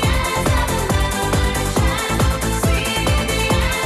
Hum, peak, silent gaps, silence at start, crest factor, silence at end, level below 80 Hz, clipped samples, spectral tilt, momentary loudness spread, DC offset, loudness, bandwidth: none; -4 dBFS; none; 0 s; 12 dB; 0 s; -22 dBFS; under 0.1%; -4.5 dB/octave; 1 LU; under 0.1%; -18 LUFS; 13 kHz